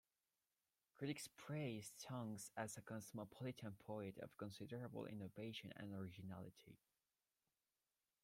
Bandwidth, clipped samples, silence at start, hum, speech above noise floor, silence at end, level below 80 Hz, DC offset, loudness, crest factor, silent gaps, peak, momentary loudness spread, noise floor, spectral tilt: 16.5 kHz; under 0.1%; 0.95 s; none; over 38 dB; 1.5 s; -84 dBFS; under 0.1%; -53 LUFS; 20 dB; none; -34 dBFS; 6 LU; under -90 dBFS; -5 dB/octave